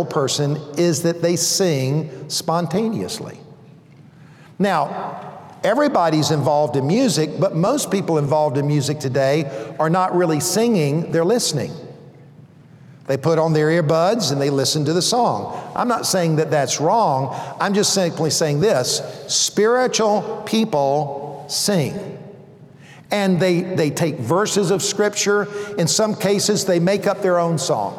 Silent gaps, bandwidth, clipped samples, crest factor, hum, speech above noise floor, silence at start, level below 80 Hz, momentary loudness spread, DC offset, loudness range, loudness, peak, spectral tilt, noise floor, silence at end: none; 17 kHz; under 0.1%; 14 dB; none; 27 dB; 0 s; -62 dBFS; 8 LU; under 0.1%; 4 LU; -19 LUFS; -6 dBFS; -4.5 dB/octave; -45 dBFS; 0 s